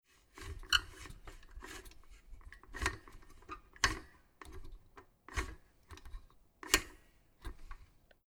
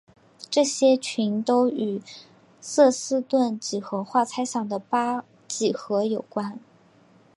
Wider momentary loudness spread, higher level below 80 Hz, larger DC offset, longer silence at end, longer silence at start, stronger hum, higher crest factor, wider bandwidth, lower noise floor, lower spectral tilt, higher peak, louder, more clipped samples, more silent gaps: first, 26 LU vs 15 LU; first, -50 dBFS vs -78 dBFS; neither; second, 0.45 s vs 0.8 s; about the same, 0.35 s vs 0.4 s; neither; first, 34 dB vs 18 dB; first, over 20 kHz vs 11.5 kHz; first, -64 dBFS vs -56 dBFS; second, -1.5 dB/octave vs -4 dB/octave; about the same, -8 dBFS vs -6 dBFS; second, -37 LUFS vs -24 LUFS; neither; neither